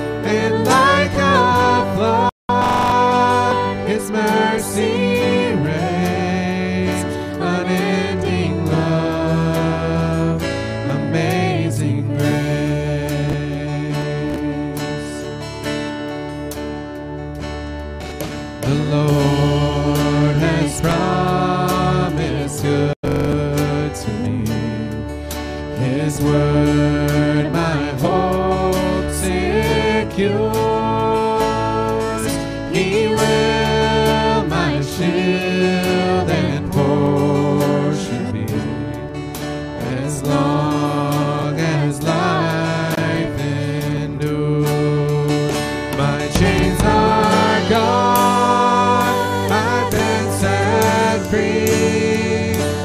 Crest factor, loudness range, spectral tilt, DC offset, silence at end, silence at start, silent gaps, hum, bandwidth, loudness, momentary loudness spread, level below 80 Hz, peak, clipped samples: 16 dB; 6 LU; -6 dB/octave; under 0.1%; 0 s; 0 s; 2.32-2.48 s, 22.96-23.03 s; none; 16 kHz; -18 LUFS; 9 LU; -34 dBFS; 0 dBFS; under 0.1%